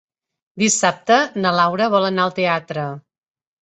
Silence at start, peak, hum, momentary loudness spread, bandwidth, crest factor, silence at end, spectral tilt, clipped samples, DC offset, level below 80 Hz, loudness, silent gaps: 0.55 s; -2 dBFS; none; 11 LU; 8.2 kHz; 18 dB; 0.65 s; -3.5 dB/octave; under 0.1%; under 0.1%; -64 dBFS; -18 LUFS; none